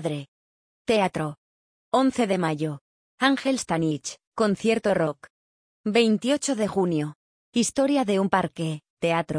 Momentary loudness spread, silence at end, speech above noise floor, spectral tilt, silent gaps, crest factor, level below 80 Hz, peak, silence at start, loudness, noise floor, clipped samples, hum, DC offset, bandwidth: 10 LU; 0 s; over 66 dB; -5 dB/octave; 0.28-0.85 s, 1.38-1.92 s, 2.81-3.18 s, 4.27-4.32 s, 5.30-5.84 s, 7.16-7.52 s, 8.90-8.97 s; 18 dB; -62 dBFS; -6 dBFS; 0 s; -25 LUFS; under -90 dBFS; under 0.1%; none; under 0.1%; 10.5 kHz